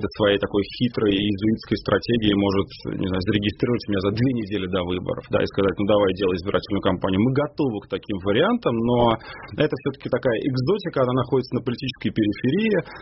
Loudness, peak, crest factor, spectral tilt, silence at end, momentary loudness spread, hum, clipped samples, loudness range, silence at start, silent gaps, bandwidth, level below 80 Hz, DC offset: -23 LUFS; -4 dBFS; 18 dB; -5 dB/octave; 0 s; 6 LU; none; under 0.1%; 1 LU; 0 s; none; 6 kHz; -46 dBFS; under 0.1%